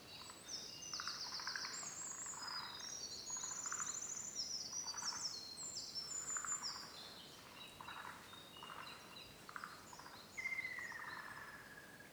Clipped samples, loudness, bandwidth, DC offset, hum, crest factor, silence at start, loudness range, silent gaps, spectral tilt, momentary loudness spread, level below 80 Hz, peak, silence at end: under 0.1%; -46 LUFS; over 20 kHz; under 0.1%; none; 20 dB; 0 s; 8 LU; none; 0.5 dB/octave; 12 LU; -78 dBFS; -28 dBFS; 0 s